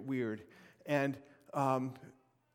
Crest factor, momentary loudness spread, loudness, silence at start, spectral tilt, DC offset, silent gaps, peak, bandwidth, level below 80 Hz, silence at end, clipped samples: 20 dB; 16 LU; -37 LUFS; 0 s; -7 dB/octave; under 0.1%; none; -18 dBFS; 16.5 kHz; -82 dBFS; 0.45 s; under 0.1%